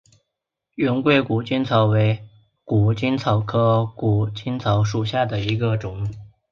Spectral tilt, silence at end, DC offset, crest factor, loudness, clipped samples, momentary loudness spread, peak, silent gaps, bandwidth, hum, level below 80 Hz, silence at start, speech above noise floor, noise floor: -7.5 dB/octave; 0.25 s; under 0.1%; 16 dB; -21 LUFS; under 0.1%; 8 LU; -4 dBFS; none; 6.8 kHz; none; -48 dBFS; 0.8 s; 62 dB; -82 dBFS